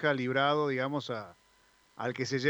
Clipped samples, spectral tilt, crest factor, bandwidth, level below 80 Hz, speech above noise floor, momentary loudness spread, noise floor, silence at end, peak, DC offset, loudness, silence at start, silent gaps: under 0.1%; -5.5 dB/octave; 18 dB; over 20 kHz; -76 dBFS; 35 dB; 12 LU; -66 dBFS; 0 s; -14 dBFS; under 0.1%; -31 LUFS; 0 s; none